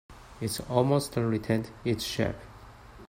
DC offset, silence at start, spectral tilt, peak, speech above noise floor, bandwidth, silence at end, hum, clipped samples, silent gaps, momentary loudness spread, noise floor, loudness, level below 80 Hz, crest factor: under 0.1%; 0.1 s; -5.5 dB/octave; -8 dBFS; 21 dB; 16 kHz; 0.05 s; none; under 0.1%; none; 11 LU; -49 dBFS; -29 LUFS; -52 dBFS; 22 dB